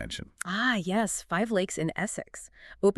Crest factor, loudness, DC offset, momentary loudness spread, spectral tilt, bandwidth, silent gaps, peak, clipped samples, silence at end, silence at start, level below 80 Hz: 18 dB; -29 LUFS; under 0.1%; 14 LU; -4 dB/octave; 13.5 kHz; none; -12 dBFS; under 0.1%; 0.05 s; 0 s; -56 dBFS